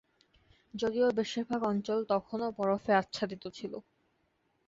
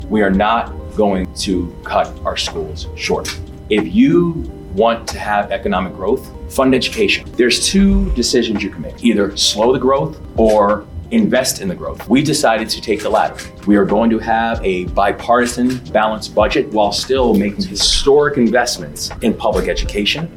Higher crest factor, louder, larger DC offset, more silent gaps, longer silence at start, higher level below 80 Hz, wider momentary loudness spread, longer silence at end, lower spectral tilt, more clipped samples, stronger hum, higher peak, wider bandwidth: first, 20 dB vs 14 dB; second, -32 LUFS vs -15 LUFS; neither; neither; first, 0.75 s vs 0 s; second, -70 dBFS vs -30 dBFS; first, 13 LU vs 9 LU; first, 0.85 s vs 0 s; about the same, -5.5 dB/octave vs -4.5 dB/octave; neither; neither; second, -14 dBFS vs -2 dBFS; second, 7.8 kHz vs 18 kHz